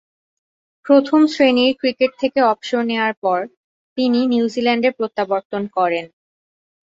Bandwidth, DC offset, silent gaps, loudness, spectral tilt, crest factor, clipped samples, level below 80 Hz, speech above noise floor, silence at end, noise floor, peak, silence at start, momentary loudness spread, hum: 7.8 kHz; under 0.1%; 3.17-3.22 s, 3.57-3.96 s, 5.45-5.50 s; -18 LUFS; -5 dB/octave; 16 dB; under 0.1%; -64 dBFS; over 73 dB; 0.8 s; under -90 dBFS; -2 dBFS; 0.85 s; 9 LU; none